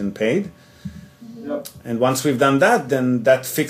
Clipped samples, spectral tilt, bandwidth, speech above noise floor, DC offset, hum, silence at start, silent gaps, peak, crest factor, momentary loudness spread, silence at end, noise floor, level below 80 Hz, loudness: under 0.1%; -5 dB/octave; 16 kHz; 20 dB; under 0.1%; none; 0 s; none; -2 dBFS; 18 dB; 21 LU; 0 s; -39 dBFS; -56 dBFS; -19 LUFS